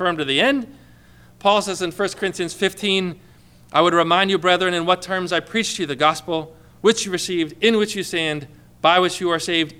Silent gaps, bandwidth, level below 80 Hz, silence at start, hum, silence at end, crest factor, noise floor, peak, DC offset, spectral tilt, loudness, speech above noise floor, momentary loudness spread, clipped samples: none; 16.5 kHz; -56 dBFS; 0 s; 60 Hz at -50 dBFS; 0.05 s; 18 dB; -48 dBFS; -2 dBFS; under 0.1%; -3.5 dB/octave; -19 LUFS; 28 dB; 8 LU; under 0.1%